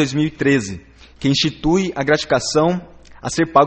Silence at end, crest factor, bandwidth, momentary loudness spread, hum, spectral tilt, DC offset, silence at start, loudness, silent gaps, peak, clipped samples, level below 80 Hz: 0 s; 18 dB; 8.8 kHz; 11 LU; none; -5 dB/octave; under 0.1%; 0 s; -18 LUFS; none; 0 dBFS; under 0.1%; -42 dBFS